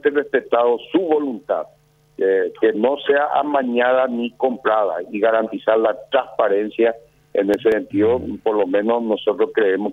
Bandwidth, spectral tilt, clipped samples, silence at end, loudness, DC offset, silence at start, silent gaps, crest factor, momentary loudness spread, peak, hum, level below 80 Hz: 5 kHz; -7 dB/octave; under 0.1%; 0 s; -19 LUFS; under 0.1%; 0.05 s; none; 16 dB; 5 LU; -2 dBFS; none; -58 dBFS